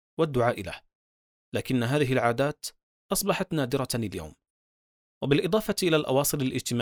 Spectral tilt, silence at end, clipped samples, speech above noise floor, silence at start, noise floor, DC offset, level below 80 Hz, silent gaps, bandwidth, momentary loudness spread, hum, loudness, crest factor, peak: -5 dB/octave; 0 s; under 0.1%; over 64 dB; 0.2 s; under -90 dBFS; under 0.1%; -54 dBFS; 0.95-1.52 s, 2.83-3.09 s, 4.50-5.21 s; over 20 kHz; 13 LU; none; -27 LUFS; 20 dB; -8 dBFS